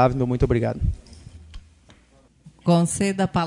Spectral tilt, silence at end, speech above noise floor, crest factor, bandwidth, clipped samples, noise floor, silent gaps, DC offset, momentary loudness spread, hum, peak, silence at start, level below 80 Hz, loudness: -6.5 dB/octave; 0 s; 36 dB; 18 dB; 11 kHz; under 0.1%; -56 dBFS; none; under 0.1%; 11 LU; none; -4 dBFS; 0 s; -36 dBFS; -22 LUFS